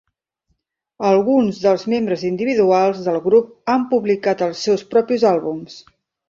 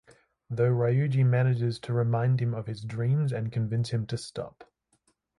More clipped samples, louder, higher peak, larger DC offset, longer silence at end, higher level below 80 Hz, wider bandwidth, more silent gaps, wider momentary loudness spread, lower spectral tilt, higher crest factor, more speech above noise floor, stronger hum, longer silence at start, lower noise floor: neither; first, -17 LUFS vs -28 LUFS; first, -2 dBFS vs -14 dBFS; neither; second, 0.5 s vs 0.75 s; about the same, -62 dBFS vs -62 dBFS; second, 7.6 kHz vs 11 kHz; neither; second, 6 LU vs 11 LU; second, -6 dB/octave vs -8 dB/octave; about the same, 16 dB vs 14 dB; first, 53 dB vs 45 dB; neither; first, 1 s vs 0.5 s; about the same, -70 dBFS vs -72 dBFS